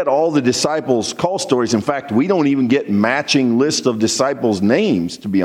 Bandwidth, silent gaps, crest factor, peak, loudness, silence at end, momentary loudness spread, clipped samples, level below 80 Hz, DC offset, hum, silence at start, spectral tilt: 14 kHz; none; 14 dB; -2 dBFS; -16 LUFS; 0 s; 4 LU; under 0.1%; -60 dBFS; under 0.1%; none; 0 s; -4.5 dB/octave